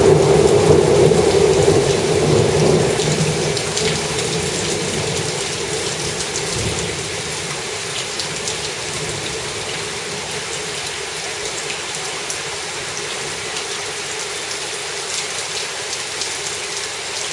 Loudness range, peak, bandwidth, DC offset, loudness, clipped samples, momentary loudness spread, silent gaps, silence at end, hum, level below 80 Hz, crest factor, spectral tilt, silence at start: 8 LU; 0 dBFS; 11.5 kHz; under 0.1%; -19 LUFS; under 0.1%; 10 LU; none; 0 s; none; -42 dBFS; 18 dB; -3.5 dB/octave; 0 s